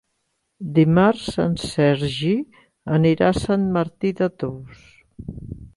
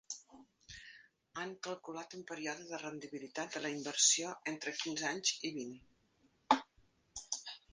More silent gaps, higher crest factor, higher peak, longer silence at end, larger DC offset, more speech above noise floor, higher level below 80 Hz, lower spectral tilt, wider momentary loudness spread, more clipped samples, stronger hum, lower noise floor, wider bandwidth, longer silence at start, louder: neither; second, 16 dB vs 28 dB; first, -4 dBFS vs -14 dBFS; about the same, 0.1 s vs 0.15 s; neither; first, 53 dB vs 34 dB; first, -46 dBFS vs -76 dBFS; first, -7 dB/octave vs -1 dB/octave; about the same, 20 LU vs 20 LU; neither; neither; about the same, -73 dBFS vs -74 dBFS; first, 11.5 kHz vs 10 kHz; first, 0.6 s vs 0.1 s; first, -20 LUFS vs -37 LUFS